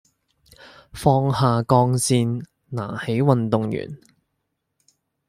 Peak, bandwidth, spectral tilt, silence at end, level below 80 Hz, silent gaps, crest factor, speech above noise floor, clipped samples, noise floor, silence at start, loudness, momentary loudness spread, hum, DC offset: -2 dBFS; 15 kHz; -6 dB/octave; 1.3 s; -54 dBFS; none; 20 dB; 56 dB; under 0.1%; -76 dBFS; 0.6 s; -21 LUFS; 15 LU; none; under 0.1%